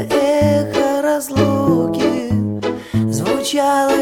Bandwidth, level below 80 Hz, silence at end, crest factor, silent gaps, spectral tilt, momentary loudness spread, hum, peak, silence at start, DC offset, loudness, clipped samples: 17.5 kHz; -44 dBFS; 0 s; 14 dB; none; -5.5 dB/octave; 5 LU; none; -2 dBFS; 0 s; under 0.1%; -17 LUFS; under 0.1%